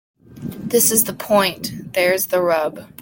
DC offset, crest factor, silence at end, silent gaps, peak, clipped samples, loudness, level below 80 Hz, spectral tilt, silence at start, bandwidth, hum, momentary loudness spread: under 0.1%; 18 dB; 0 s; none; -2 dBFS; under 0.1%; -17 LUFS; -56 dBFS; -2.5 dB/octave; 0.3 s; 17 kHz; none; 15 LU